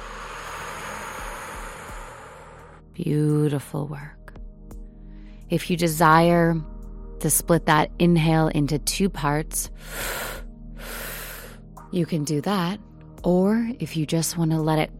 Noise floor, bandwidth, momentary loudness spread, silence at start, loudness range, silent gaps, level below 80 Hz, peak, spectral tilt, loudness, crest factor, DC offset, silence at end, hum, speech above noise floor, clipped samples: -45 dBFS; 16.5 kHz; 22 LU; 0 s; 9 LU; none; -40 dBFS; -2 dBFS; -5 dB/octave; -23 LUFS; 22 dB; under 0.1%; 0 s; none; 23 dB; under 0.1%